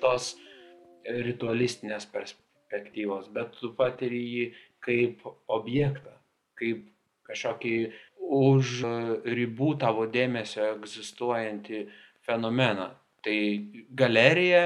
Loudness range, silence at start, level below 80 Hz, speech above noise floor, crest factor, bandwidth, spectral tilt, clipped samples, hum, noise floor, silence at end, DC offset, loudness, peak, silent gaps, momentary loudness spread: 5 LU; 0 s; -72 dBFS; 26 dB; 24 dB; 11.5 kHz; -5.5 dB/octave; under 0.1%; none; -53 dBFS; 0 s; under 0.1%; -28 LUFS; -4 dBFS; none; 15 LU